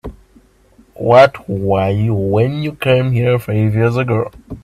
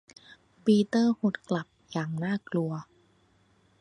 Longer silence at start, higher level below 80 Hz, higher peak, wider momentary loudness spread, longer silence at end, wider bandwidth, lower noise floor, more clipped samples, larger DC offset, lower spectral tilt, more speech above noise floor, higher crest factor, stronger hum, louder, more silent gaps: second, 0.05 s vs 0.65 s; first, -42 dBFS vs -70 dBFS; first, 0 dBFS vs -12 dBFS; about the same, 11 LU vs 11 LU; second, 0.05 s vs 0.95 s; first, 13.5 kHz vs 11.5 kHz; second, -49 dBFS vs -65 dBFS; neither; neither; about the same, -8 dB/octave vs -7 dB/octave; about the same, 36 dB vs 38 dB; about the same, 14 dB vs 18 dB; neither; first, -14 LUFS vs -28 LUFS; neither